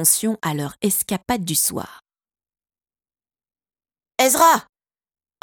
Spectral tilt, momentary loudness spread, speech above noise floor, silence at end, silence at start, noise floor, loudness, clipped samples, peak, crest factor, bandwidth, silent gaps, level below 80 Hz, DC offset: -3 dB/octave; 13 LU; over 71 dB; 0.8 s; 0 s; under -90 dBFS; -19 LUFS; under 0.1%; -2 dBFS; 22 dB; 18 kHz; none; -56 dBFS; under 0.1%